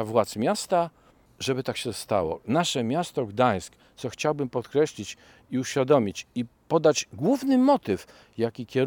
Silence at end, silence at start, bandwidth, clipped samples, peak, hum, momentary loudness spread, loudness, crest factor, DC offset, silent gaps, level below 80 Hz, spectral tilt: 0 s; 0 s; 19 kHz; under 0.1%; -8 dBFS; none; 12 LU; -26 LUFS; 18 dB; under 0.1%; none; -64 dBFS; -5 dB/octave